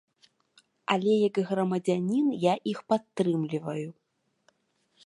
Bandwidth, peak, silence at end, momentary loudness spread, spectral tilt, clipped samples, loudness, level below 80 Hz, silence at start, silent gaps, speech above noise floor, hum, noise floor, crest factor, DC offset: 11.5 kHz; -8 dBFS; 1.15 s; 10 LU; -7 dB/octave; under 0.1%; -28 LUFS; -78 dBFS; 0.9 s; none; 45 dB; none; -72 dBFS; 22 dB; under 0.1%